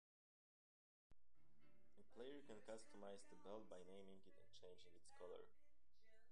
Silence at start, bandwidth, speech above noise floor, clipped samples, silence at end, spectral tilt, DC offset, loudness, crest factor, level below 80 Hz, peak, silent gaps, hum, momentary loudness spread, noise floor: 1.1 s; 10 kHz; 21 dB; under 0.1%; 0 s; -4.5 dB/octave; 0.1%; -62 LUFS; 20 dB; -86 dBFS; -42 dBFS; none; none; 7 LU; -84 dBFS